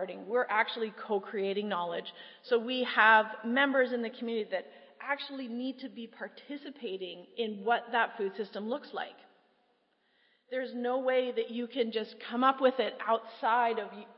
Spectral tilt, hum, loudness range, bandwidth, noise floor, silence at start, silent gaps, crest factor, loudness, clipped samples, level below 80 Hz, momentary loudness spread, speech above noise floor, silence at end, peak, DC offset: -7.5 dB/octave; none; 8 LU; 5.8 kHz; -73 dBFS; 0 s; none; 24 dB; -31 LUFS; under 0.1%; under -90 dBFS; 15 LU; 41 dB; 0.05 s; -8 dBFS; under 0.1%